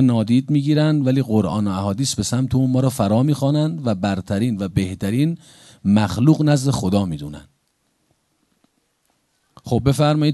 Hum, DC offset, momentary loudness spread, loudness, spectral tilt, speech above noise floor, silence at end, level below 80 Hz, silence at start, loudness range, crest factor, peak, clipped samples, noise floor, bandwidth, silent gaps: none; under 0.1%; 6 LU; -19 LUFS; -6.5 dB/octave; 49 dB; 0 s; -42 dBFS; 0 s; 6 LU; 18 dB; -2 dBFS; under 0.1%; -67 dBFS; 12.5 kHz; none